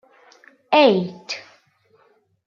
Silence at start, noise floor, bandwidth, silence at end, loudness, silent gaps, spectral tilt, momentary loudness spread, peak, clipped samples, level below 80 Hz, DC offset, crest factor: 0.7 s; -60 dBFS; 7.4 kHz; 1.05 s; -18 LUFS; none; -5.5 dB/octave; 17 LU; -2 dBFS; under 0.1%; -76 dBFS; under 0.1%; 20 dB